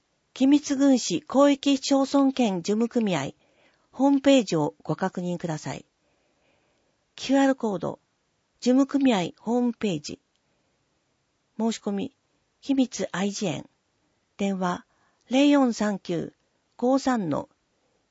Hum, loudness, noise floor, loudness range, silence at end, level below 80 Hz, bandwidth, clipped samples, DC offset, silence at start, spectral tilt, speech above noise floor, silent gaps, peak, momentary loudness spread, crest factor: none; -24 LUFS; -72 dBFS; 7 LU; 0.65 s; -68 dBFS; 8 kHz; under 0.1%; under 0.1%; 0.35 s; -5 dB/octave; 49 dB; none; -8 dBFS; 15 LU; 18 dB